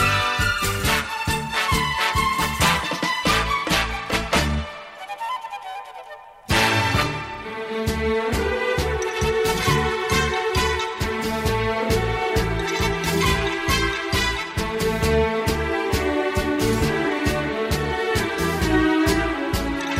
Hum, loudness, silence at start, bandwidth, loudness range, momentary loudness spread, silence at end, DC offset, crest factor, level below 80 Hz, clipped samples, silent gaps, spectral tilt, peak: none; -22 LUFS; 0 s; 16 kHz; 3 LU; 9 LU; 0 s; under 0.1%; 18 dB; -32 dBFS; under 0.1%; none; -4 dB/octave; -4 dBFS